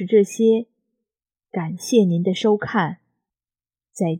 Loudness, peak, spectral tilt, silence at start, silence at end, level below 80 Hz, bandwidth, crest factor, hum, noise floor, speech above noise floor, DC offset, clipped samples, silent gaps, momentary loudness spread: -20 LUFS; -4 dBFS; -6 dB/octave; 0 s; 0 s; -70 dBFS; 15 kHz; 18 dB; none; under -90 dBFS; over 71 dB; under 0.1%; under 0.1%; none; 13 LU